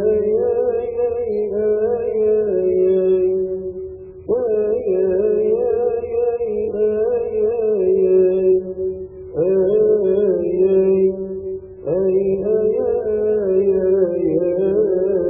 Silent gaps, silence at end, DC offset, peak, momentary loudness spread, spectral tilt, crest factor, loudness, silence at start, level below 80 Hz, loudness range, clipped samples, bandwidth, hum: none; 0 s; under 0.1%; -6 dBFS; 9 LU; -13.5 dB/octave; 12 dB; -18 LUFS; 0 s; -48 dBFS; 2 LU; under 0.1%; 3.5 kHz; none